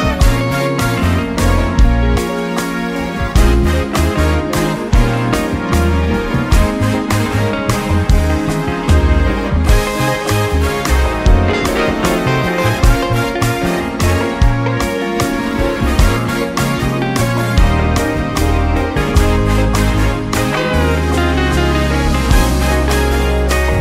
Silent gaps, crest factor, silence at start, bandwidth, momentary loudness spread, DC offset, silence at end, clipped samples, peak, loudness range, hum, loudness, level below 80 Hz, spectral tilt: none; 12 dB; 0 s; 16 kHz; 3 LU; under 0.1%; 0 s; under 0.1%; 0 dBFS; 1 LU; none; -15 LUFS; -18 dBFS; -5.5 dB/octave